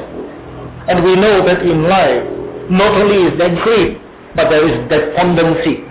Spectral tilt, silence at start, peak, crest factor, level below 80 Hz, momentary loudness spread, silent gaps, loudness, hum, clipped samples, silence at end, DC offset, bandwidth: -10.5 dB/octave; 0 s; -4 dBFS; 8 dB; -36 dBFS; 16 LU; none; -12 LUFS; none; under 0.1%; 0 s; under 0.1%; 4 kHz